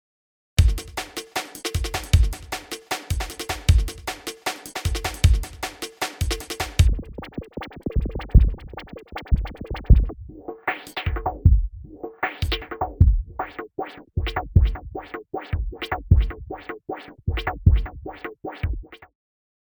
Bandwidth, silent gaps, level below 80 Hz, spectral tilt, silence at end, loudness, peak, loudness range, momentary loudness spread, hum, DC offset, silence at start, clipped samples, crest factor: over 20 kHz; none; -26 dBFS; -5 dB/octave; 0.85 s; -25 LUFS; -2 dBFS; 1 LU; 15 LU; none; under 0.1%; 0.6 s; under 0.1%; 22 dB